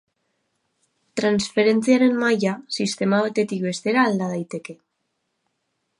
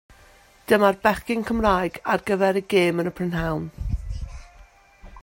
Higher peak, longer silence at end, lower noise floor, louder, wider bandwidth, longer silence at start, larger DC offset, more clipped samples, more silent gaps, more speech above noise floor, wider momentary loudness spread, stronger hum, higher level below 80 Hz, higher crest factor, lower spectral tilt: about the same, -4 dBFS vs -4 dBFS; first, 1.25 s vs 0 s; first, -75 dBFS vs -53 dBFS; about the same, -21 LUFS vs -23 LUFS; second, 11.5 kHz vs 16.5 kHz; first, 1.15 s vs 0.7 s; neither; neither; neither; first, 54 dB vs 31 dB; about the same, 13 LU vs 13 LU; neither; second, -66 dBFS vs -38 dBFS; about the same, 18 dB vs 20 dB; about the same, -5 dB/octave vs -6 dB/octave